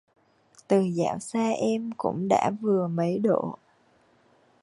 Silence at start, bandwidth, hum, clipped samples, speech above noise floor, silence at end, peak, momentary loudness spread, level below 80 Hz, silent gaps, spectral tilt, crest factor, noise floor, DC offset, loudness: 0.7 s; 11.5 kHz; none; under 0.1%; 38 dB; 1.1 s; -8 dBFS; 5 LU; -68 dBFS; none; -7 dB/octave; 20 dB; -63 dBFS; under 0.1%; -26 LUFS